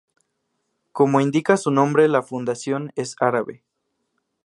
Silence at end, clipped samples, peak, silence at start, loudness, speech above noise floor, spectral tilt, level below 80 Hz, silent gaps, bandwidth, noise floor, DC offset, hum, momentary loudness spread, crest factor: 0.9 s; under 0.1%; -2 dBFS; 0.95 s; -20 LUFS; 55 dB; -6 dB/octave; -70 dBFS; none; 11.5 kHz; -75 dBFS; under 0.1%; none; 10 LU; 20 dB